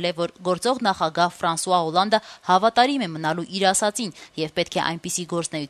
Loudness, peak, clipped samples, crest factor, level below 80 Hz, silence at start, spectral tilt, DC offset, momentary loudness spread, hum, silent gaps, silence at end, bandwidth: -22 LUFS; -4 dBFS; under 0.1%; 18 dB; -62 dBFS; 0 s; -3.5 dB/octave; under 0.1%; 8 LU; none; none; 0 s; 13.5 kHz